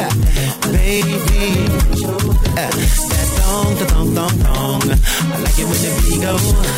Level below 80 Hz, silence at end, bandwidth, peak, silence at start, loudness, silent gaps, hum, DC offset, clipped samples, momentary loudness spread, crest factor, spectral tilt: -16 dBFS; 0 s; 16.5 kHz; -2 dBFS; 0 s; -16 LUFS; none; none; under 0.1%; under 0.1%; 2 LU; 12 dB; -4.5 dB/octave